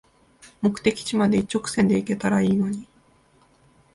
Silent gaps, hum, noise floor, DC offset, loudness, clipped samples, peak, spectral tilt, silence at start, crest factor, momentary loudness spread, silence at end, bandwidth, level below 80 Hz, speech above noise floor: none; none; -59 dBFS; under 0.1%; -23 LUFS; under 0.1%; -6 dBFS; -6 dB/octave; 0.45 s; 18 dB; 5 LU; 1.1 s; 11.5 kHz; -54 dBFS; 37 dB